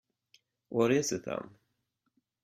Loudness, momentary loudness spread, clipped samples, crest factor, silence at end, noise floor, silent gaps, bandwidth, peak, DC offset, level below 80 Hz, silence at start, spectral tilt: -31 LUFS; 13 LU; under 0.1%; 22 dB; 1 s; -81 dBFS; none; 16 kHz; -14 dBFS; under 0.1%; -72 dBFS; 0.7 s; -4.5 dB/octave